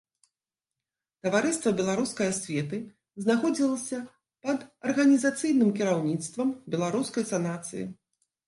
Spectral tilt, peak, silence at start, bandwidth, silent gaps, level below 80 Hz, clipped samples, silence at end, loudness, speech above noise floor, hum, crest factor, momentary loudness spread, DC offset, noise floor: -5 dB/octave; -10 dBFS; 1.25 s; 11.5 kHz; none; -70 dBFS; under 0.1%; 0.55 s; -28 LUFS; over 63 dB; none; 18 dB; 13 LU; under 0.1%; under -90 dBFS